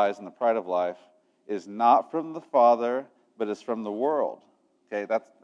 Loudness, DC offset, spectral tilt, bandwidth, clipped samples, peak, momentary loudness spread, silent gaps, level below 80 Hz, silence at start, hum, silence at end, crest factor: -26 LUFS; under 0.1%; -6 dB/octave; 7.8 kHz; under 0.1%; -6 dBFS; 14 LU; none; under -90 dBFS; 0 s; none; 0.25 s; 20 dB